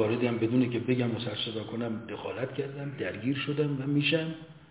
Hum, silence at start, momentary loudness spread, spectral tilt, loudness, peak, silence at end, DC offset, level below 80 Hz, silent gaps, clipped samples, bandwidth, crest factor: none; 0 s; 9 LU; -5 dB/octave; -30 LUFS; -14 dBFS; 0.05 s; under 0.1%; -66 dBFS; none; under 0.1%; 4 kHz; 16 dB